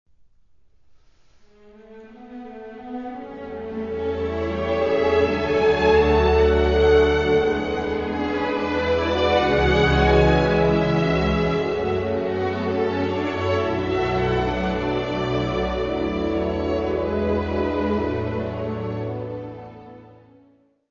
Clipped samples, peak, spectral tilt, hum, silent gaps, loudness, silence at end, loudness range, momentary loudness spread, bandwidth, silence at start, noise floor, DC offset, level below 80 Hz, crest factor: under 0.1%; -4 dBFS; -7 dB/octave; none; none; -21 LUFS; 0.85 s; 11 LU; 15 LU; 7.2 kHz; 1.8 s; -60 dBFS; 0.1%; -34 dBFS; 18 dB